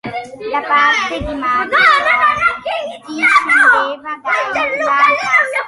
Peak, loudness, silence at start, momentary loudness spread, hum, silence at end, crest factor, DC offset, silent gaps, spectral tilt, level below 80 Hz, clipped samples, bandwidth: 0 dBFS; -13 LUFS; 0.05 s; 12 LU; none; 0 s; 14 dB; under 0.1%; none; -2.5 dB/octave; -42 dBFS; under 0.1%; 11.5 kHz